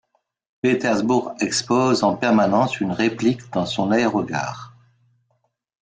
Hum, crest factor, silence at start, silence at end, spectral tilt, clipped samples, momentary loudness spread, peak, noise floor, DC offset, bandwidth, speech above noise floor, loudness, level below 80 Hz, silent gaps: none; 16 dB; 0.65 s; 1.15 s; -5 dB/octave; under 0.1%; 7 LU; -6 dBFS; -70 dBFS; under 0.1%; 9.6 kHz; 50 dB; -20 LUFS; -60 dBFS; none